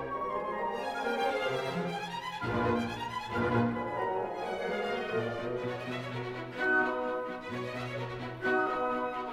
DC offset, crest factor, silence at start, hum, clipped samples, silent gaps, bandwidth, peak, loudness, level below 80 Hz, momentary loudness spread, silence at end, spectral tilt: under 0.1%; 18 dB; 0 s; none; under 0.1%; none; 16 kHz; -16 dBFS; -33 LUFS; -60 dBFS; 8 LU; 0 s; -6 dB/octave